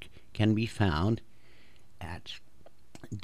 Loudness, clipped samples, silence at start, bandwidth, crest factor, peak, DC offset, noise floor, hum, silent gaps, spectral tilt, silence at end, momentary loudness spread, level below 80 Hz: -31 LUFS; under 0.1%; 0 s; 11.5 kHz; 20 dB; -14 dBFS; 0.6%; -61 dBFS; none; none; -7 dB/octave; 0 s; 19 LU; -50 dBFS